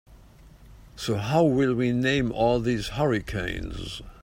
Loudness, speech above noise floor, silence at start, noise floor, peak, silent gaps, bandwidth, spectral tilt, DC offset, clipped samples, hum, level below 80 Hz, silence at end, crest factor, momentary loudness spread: -25 LUFS; 26 dB; 0.1 s; -50 dBFS; -8 dBFS; none; 16 kHz; -6.5 dB/octave; under 0.1%; under 0.1%; none; -44 dBFS; 0.1 s; 18 dB; 13 LU